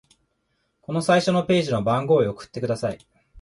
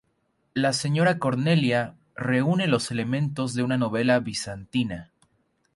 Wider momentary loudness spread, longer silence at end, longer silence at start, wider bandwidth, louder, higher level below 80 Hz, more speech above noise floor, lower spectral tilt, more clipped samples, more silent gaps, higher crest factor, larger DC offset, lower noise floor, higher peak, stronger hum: about the same, 10 LU vs 9 LU; second, 0 s vs 0.7 s; first, 0.9 s vs 0.55 s; about the same, 11.5 kHz vs 11.5 kHz; first, -22 LUFS vs -25 LUFS; about the same, -56 dBFS vs -60 dBFS; about the same, 50 dB vs 47 dB; about the same, -6 dB/octave vs -5.5 dB/octave; neither; neither; about the same, 16 dB vs 18 dB; neither; about the same, -72 dBFS vs -71 dBFS; about the same, -6 dBFS vs -8 dBFS; neither